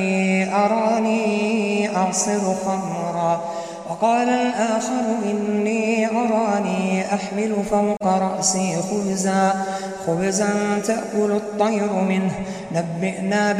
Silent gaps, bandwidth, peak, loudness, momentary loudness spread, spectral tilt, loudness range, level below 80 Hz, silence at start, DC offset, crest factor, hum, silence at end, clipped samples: none; 13 kHz; -6 dBFS; -21 LUFS; 6 LU; -5 dB/octave; 1 LU; -58 dBFS; 0 s; under 0.1%; 16 dB; none; 0 s; under 0.1%